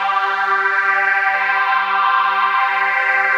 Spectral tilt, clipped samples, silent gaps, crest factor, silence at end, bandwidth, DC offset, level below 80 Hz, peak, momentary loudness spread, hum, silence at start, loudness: -1 dB/octave; under 0.1%; none; 12 dB; 0 s; 16 kHz; under 0.1%; under -90 dBFS; -4 dBFS; 1 LU; none; 0 s; -15 LUFS